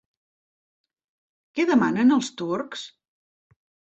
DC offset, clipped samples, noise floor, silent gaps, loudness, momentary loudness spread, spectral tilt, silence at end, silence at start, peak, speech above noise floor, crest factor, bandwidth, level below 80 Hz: under 0.1%; under 0.1%; under -90 dBFS; none; -22 LUFS; 16 LU; -5 dB/octave; 1 s; 1.55 s; -8 dBFS; over 68 dB; 18 dB; 8.2 kHz; -70 dBFS